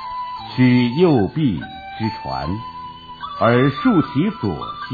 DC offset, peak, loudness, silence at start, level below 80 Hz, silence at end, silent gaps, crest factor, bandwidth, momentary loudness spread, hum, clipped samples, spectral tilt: under 0.1%; -2 dBFS; -19 LUFS; 0 s; -46 dBFS; 0 s; none; 16 dB; 4.9 kHz; 17 LU; none; under 0.1%; -9.5 dB/octave